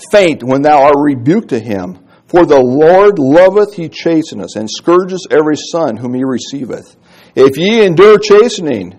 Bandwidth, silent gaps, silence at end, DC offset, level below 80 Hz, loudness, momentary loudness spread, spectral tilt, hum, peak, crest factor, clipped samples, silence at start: 11.5 kHz; none; 0.1 s; under 0.1%; -46 dBFS; -9 LUFS; 15 LU; -5.5 dB/octave; none; 0 dBFS; 10 dB; 2%; 0 s